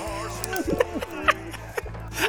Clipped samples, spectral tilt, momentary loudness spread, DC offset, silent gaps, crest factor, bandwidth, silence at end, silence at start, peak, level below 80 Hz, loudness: under 0.1%; -4 dB/octave; 10 LU; under 0.1%; none; 24 dB; over 20 kHz; 0 s; 0 s; -4 dBFS; -42 dBFS; -27 LUFS